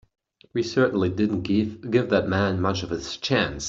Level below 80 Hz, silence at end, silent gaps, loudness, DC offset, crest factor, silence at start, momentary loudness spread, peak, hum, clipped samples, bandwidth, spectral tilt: -52 dBFS; 0 s; none; -24 LUFS; under 0.1%; 18 dB; 0.55 s; 7 LU; -6 dBFS; none; under 0.1%; 7.8 kHz; -5.5 dB/octave